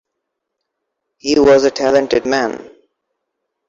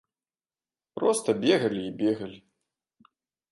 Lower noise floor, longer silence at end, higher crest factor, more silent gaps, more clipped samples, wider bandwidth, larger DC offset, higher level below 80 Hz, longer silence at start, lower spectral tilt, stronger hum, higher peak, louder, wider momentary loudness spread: second, -76 dBFS vs under -90 dBFS; second, 1 s vs 1.15 s; second, 14 dB vs 20 dB; neither; neither; second, 7.8 kHz vs 12 kHz; neither; first, -48 dBFS vs -70 dBFS; first, 1.25 s vs 0.95 s; about the same, -4 dB/octave vs -4.5 dB/octave; neither; first, -2 dBFS vs -8 dBFS; first, -14 LUFS vs -26 LUFS; about the same, 13 LU vs 13 LU